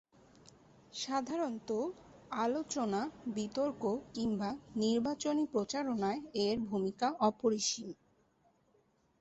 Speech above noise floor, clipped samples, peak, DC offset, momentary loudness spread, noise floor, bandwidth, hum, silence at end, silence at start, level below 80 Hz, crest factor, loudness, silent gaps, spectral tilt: 37 dB; under 0.1%; -18 dBFS; under 0.1%; 9 LU; -73 dBFS; 8.2 kHz; none; 1.25 s; 0.95 s; -70 dBFS; 18 dB; -36 LUFS; none; -4.5 dB/octave